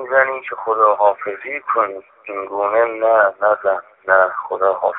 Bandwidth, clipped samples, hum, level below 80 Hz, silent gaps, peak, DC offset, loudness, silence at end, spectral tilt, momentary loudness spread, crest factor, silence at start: 3.9 kHz; under 0.1%; none; -68 dBFS; none; 0 dBFS; under 0.1%; -17 LUFS; 0 s; -7.5 dB/octave; 11 LU; 18 dB; 0 s